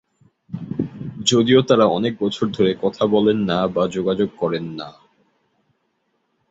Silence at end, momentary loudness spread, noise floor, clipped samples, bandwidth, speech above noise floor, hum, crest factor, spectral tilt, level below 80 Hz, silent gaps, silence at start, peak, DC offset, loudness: 1.6 s; 15 LU; -69 dBFS; under 0.1%; 8.2 kHz; 51 dB; none; 18 dB; -5.5 dB/octave; -54 dBFS; none; 0.5 s; -2 dBFS; under 0.1%; -19 LUFS